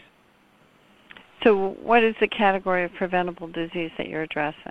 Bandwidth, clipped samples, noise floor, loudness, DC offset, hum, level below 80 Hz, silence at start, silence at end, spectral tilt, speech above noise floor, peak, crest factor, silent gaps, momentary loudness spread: 8.4 kHz; under 0.1%; -59 dBFS; -23 LUFS; under 0.1%; none; -58 dBFS; 1.15 s; 0 s; -7 dB/octave; 35 dB; -4 dBFS; 22 dB; none; 11 LU